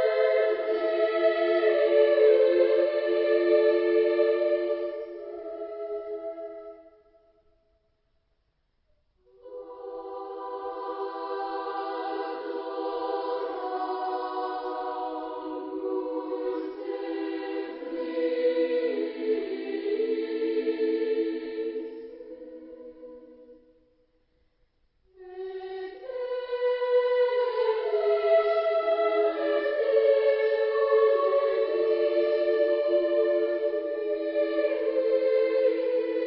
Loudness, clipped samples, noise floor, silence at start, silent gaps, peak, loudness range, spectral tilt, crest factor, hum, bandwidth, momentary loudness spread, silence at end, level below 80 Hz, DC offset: -26 LUFS; under 0.1%; -72 dBFS; 0 s; none; -10 dBFS; 17 LU; -7 dB/octave; 16 dB; none; 5.6 kHz; 16 LU; 0 s; -72 dBFS; under 0.1%